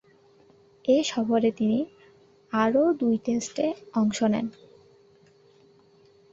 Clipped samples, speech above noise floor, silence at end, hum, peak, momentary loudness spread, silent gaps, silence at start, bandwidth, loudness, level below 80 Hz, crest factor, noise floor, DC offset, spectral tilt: under 0.1%; 34 dB; 1.85 s; none; -8 dBFS; 8 LU; none; 0.85 s; 8 kHz; -25 LUFS; -68 dBFS; 18 dB; -58 dBFS; under 0.1%; -5 dB/octave